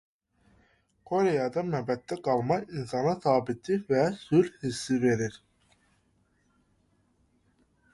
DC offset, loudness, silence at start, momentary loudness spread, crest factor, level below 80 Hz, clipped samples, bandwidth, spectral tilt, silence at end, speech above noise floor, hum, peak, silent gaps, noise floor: under 0.1%; -28 LUFS; 1.1 s; 6 LU; 20 dB; -64 dBFS; under 0.1%; 11.5 kHz; -6.5 dB/octave; 2.55 s; 42 dB; none; -10 dBFS; none; -70 dBFS